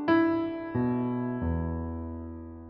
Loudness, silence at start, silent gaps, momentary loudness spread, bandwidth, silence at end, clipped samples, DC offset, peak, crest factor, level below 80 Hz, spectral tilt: -30 LUFS; 0 s; none; 14 LU; 5.4 kHz; 0 s; under 0.1%; under 0.1%; -14 dBFS; 16 dB; -44 dBFS; -7 dB/octave